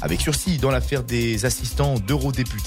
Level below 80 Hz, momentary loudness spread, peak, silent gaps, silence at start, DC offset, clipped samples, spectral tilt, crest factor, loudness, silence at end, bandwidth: -30 dBFS; 2 LU; -10 dBFS; none; 0 s; under 0.1%; under 0.1%; -5 dB/octave; 12 dB; -22 LUFS; 0 s; 16 kHz